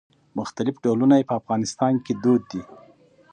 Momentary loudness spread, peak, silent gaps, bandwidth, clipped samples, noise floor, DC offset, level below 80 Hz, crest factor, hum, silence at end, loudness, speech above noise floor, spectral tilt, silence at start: 15 LU; -6 dBFS; none; 9.4 kHz; under 0.1%; -53 dBFS; under 0.1%; -64 dBFS; 18 dB; none; 0.7 s; -22 LUFS; 32 dB; -6.5 dB/octave; 0.35 s